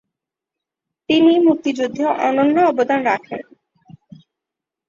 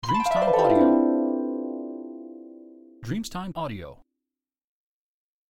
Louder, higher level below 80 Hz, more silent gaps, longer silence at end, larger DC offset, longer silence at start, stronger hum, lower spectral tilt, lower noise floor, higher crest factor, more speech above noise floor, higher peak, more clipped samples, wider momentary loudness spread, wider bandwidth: first, -16 LUFS vs -24 LUFS; second, -64 dBFS vs -54 dBFS; neither; about the same, 1.45 s vs 1.55 s; neither; first, 1.1 s vs 0.05 s; neither; about the same, -5.5 dB/octave vs -6.5 dB/octave; second, -85 dBFS vs -89 dBFS; about the same, 16 dB vs 20 dB; first, 69 dB vs 64 dB; about the same, -4 dBFS vs -6 dBFS; neither; second, 9 LU vs 23 LU; second, 7.4 kHz vs 15.5 kHz